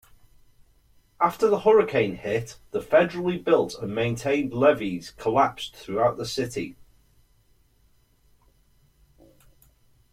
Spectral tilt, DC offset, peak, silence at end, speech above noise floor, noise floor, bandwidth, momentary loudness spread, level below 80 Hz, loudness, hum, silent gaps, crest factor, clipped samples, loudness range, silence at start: -5.5 dB/octave; under 0.1%; -6 dBFS; 3.4 s; 38 dB; -62 dBFS; 15.5 kHz; 12 LU; -58 dBFS; -24 LUFS; none; none; 20 dB; under 0.1%; 9 LU; 1.2 s